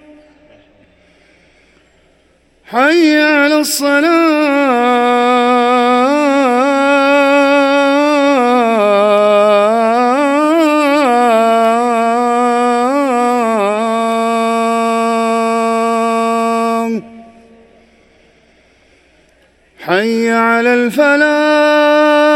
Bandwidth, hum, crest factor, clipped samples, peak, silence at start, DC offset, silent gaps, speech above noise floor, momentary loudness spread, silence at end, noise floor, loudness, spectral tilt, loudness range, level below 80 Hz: 16.5 kHz; none; 12 dB; under 0.1%; 0 dBFS; 2.7 s; under 0.1%; none; 42 dB; 4 LU; 0 s; -52 dBFS; -11 LUFS; -4 dB/octave; 8 LU; -58 dBFS